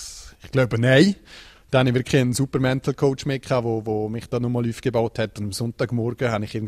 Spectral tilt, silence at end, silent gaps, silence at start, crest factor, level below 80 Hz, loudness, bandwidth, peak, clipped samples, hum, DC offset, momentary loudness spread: -6 dB/octave; 0 s; none; 0 s; 20 dB; -48 dBFS; -22 LUFS; 14 kHz; -2 dBFS; under 0.1%; none; under 0.1%; 10 LU